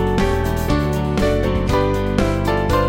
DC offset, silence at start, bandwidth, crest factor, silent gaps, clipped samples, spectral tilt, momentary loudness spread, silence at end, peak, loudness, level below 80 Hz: under 0.1%; 0 s; 17 kHz; 16 dB; none; under 0.1%; -6.5 dB/octave; 1 LU; 0 s; -2 dBFS; -19 LUFS; -24 dBFS